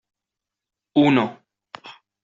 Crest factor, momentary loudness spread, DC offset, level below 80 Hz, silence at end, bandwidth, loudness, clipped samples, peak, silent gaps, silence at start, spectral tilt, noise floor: 22 dB; 23 LU; under 0.1%; -66 dBFS; 0.3 s; 7.6 kHz; -20 LUFS; under 0.1%; -4 dBFS; none; 0.95 s; -5 dB/octave; -87 dBFS